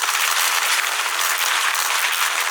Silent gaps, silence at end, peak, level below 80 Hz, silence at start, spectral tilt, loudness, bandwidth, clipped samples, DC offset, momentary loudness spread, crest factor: none; 0 s; -4 dBFS; under -90 dBFS; 0 s; 5.5 dB/octave; -18 LUFS; over 20 kHz; under 0.1%; under 0.1%; 2 LU; 16 dB